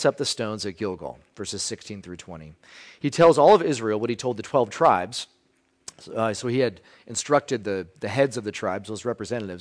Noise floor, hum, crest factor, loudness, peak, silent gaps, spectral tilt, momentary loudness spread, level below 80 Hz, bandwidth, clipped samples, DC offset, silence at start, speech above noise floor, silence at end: -66 dBFS; none; 18 dB; -24 LUFS; -6 dBFS; none; -4.5 dB/octave; 20 LU; -60 dBFS; 10.5 kHz; under 0.1%; under 0.1%; 0 s; 42 dB; 0 s